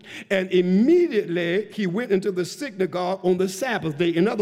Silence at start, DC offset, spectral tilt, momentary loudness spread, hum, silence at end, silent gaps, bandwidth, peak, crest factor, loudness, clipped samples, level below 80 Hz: 0.05 s; under 0.1%; -6 dB/octave; 8 LU; none; 0 s; none; 15 kHz; -8 dBFS; 14 dB; -22 LUFS; under 0.1%; -68 dBFS